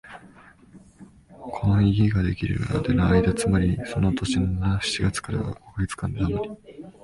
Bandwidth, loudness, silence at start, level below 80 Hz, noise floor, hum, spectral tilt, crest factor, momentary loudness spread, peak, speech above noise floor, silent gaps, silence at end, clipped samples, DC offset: 11.5 kHz; -24 LUFS; 0.05 s; -36 dBFS; -50 dBFS; none; -6.5 dB/octave; 16 dB; 15 LU; -8 dBFS; 28 dB; none; 0.15 s; under 0.1%; under 0.1%